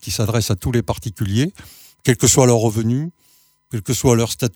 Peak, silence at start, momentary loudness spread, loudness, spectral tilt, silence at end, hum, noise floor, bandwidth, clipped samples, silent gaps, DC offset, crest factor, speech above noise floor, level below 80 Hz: 0 dBFS; 0.05 s; 12 LU; -18 LUFS; -5 dB/octave; 0.05 s; none; -56 dBFS; 20 kHz; under 0.1%; none; under 0.1%; 18 dB; 39 dB; -42 dBFS